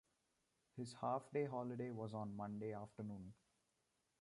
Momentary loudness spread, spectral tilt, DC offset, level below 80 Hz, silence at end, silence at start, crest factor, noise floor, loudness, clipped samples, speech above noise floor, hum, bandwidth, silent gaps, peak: 11 LU; -7.5 dB/octave; under 0.1%; -80 dBFS; 0.85 s; 0.75 s; 18 dB; -86 dBFS; -47 LUFS; under 0.1%; 39 dB; none; 11.5 kHz; none; -30 dBFS